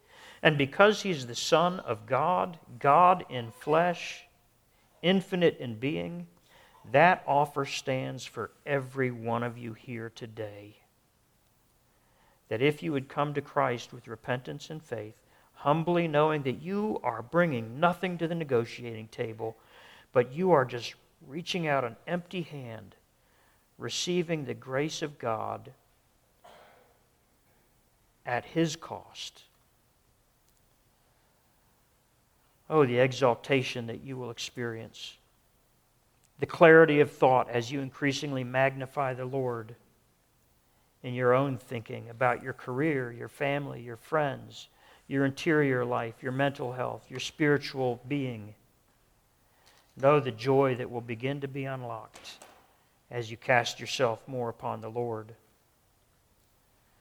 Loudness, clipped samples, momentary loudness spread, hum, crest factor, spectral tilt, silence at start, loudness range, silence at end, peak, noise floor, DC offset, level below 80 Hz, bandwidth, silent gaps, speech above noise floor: -29 LUFS; under 0.1%; 16 LU; none; 26 dB; -5.5 dB/octave; 0.2 s; 12 LU; 1.65 s; -4 dBFS; -68 dBFS; under 0.1%; -68 dBFS; 19.5 kHz; none; 39 dB